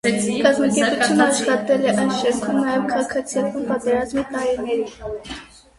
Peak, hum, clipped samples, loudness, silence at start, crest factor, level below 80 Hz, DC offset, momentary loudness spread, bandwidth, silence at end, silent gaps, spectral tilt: -2 dBFS; none; under 0.1%; -20 LUFS; 0.05 s; 18 dB; -52 dBFS; under 0.1%; 11 LU; 11.5 kHz; 0.35 s; none; -4 dB/octave